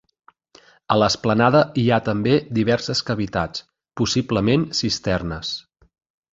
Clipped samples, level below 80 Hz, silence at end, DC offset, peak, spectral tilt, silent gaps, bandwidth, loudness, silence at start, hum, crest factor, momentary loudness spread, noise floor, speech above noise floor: under 0.1%; -46 dBFS; 0.75 s; under 0.1%; -2 dBFS; -5.5 dB/octave; none; 8 kHz; -20 LUFS; 0.9 s; none; 20 dB; 11 LU; -53 dBFS; 33 dB